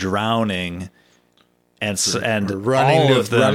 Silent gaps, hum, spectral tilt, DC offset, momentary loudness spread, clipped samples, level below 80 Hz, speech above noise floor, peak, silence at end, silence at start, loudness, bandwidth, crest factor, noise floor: none; 60 Hz at -50 dBFS; -4.5 dB/octave; under 0.1%; 13 LU; under 0.1%; -56 dBFS; 42 dB; -2 dBFS; 0 s; 0 s; -18 LUFS; 16 kHz; 16 dB; -60 dBFS